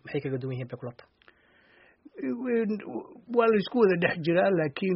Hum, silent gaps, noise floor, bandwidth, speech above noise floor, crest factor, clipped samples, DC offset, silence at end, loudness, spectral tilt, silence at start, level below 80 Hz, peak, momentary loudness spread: none; none; -61 dBFS; 5.8 kHz; 34 dB; 18 dB; under 0.1%; under 0.1%; 0 s; -27 LUFS; -5.5 dB/octave; 0.05 s; -70 dBFS; -10 dBFS; 16 LU